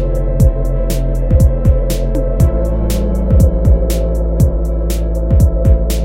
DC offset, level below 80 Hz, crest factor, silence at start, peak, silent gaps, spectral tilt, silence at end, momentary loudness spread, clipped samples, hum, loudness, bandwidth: under 0.1%; -14 dBFS; 12 dB; 0 s; 0 dBFS; none; -7.5 dB/octave; 0 s; 6 LU; under 0.1%; none; -14 LUFS; 16.5 kHz